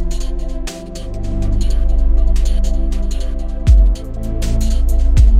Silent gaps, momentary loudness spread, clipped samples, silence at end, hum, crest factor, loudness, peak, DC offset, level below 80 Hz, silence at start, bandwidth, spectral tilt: none; 13 LU; under 0.1%; 0 s; none; 12 dB; -19 LUFS; 0 dBFS; under 0.1%; -12 dBFS; 0 s; 10.5 kHz; -6.5 dB/octave